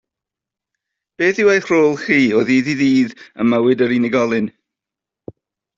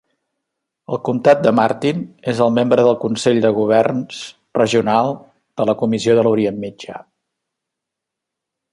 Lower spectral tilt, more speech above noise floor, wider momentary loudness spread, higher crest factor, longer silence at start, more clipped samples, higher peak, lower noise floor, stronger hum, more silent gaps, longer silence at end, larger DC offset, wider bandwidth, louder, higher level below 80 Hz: about the same, -6 dB/octave vs -6 dB/octave; first, 71 dB vs 66 dB; second, 6 LU vs 16 LU; about the same, 14 dB vs 16 dB; first, 1.2 s vs 0.9 s; neither; about the same, -2 dBFS vs -2 dBFS; first, -86 dBFS vs -82 dBFS; neither; neither; second, 1.3 s vs 1.75 s; neither; second, 7.6 kHz vs 11.5 kHz; about the same, -16 LUFS vs -16 LUFS; about the same, -60 dBFS vs -58 dBFS